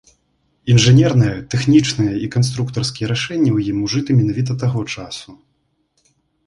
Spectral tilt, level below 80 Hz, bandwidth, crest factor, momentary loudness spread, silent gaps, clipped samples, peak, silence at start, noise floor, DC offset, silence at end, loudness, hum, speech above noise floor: -6 dB/octave; -46 dBFS; 11.5 kHz; 16 dB; 13 LU; none; under 0.1%; -2 dBFS; 0.65 s; -65 dBFS; under 0.1%; 1.15 s; -16 LUFS; none; 50 dB